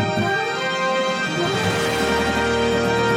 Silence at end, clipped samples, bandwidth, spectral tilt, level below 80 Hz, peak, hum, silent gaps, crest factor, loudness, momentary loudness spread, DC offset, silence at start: 0 s; under 0.1%; 16.5 kHz; -4.5 dB/octave; -42 dBFS; -8 dBFS; none; none; 12 dB; -20 LUFS; 2 LU; under 0.1%; 0 s